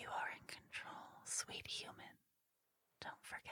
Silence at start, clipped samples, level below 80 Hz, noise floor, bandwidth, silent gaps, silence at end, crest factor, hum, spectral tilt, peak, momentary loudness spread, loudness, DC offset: 0 s; under 0.1%; -82 dBFS; -85 dBFS; 19 kHz; none; 0 s; 20 dB; none; -0.5 dB/octave; -30 dBFS; 11 LU; -48 LUFS; under 0.1%